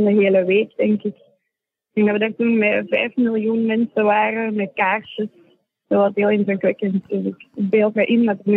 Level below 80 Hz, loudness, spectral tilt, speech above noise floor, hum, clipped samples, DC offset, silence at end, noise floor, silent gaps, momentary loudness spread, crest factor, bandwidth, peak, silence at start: -72 dBFS; -19 LUFS; -9.5 dB/octave; 62 dB; none; under 0.1%; under 0.1%; 0 s; -80 dBFS; none; 8 LU; 14 dB; 4 kHz; -6 dBFS; 0 s